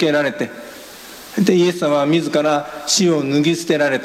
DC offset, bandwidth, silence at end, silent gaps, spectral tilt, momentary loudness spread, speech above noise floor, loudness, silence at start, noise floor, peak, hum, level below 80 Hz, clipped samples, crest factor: under 0.1%; 16 kHz; 0 s; none; -4.5 dB/octave; 20 LU; 20 dB; -17 LUFS; 0 s; -37 dBFS; 0 dBFS; none; -60 dBFS; under 0.1%; 16 dB